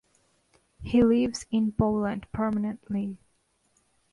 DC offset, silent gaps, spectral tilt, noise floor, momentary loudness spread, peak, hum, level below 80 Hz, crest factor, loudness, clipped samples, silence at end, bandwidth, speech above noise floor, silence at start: under 0.1%; none; -7 dB/octave; -70 dBFS; 12 LU; -12 dBFS; none; -50 dBFS; 16 dB; -27 LUFS; under 0.1%; 0.95 s; 11.5 kHz; 44 dB; 0.8 s